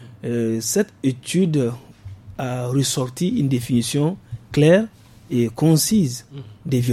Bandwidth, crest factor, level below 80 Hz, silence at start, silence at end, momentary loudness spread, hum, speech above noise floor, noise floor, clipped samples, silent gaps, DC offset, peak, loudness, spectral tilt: 16 kHz; 18 dB; -52 dBFS; 0 s; 0 s; 18 LU; none; 20 dB; -39 dBFS; under 0.1%; none; under 0.1%; -2 dBFS; -20 LUFS; -5.5 dB/octave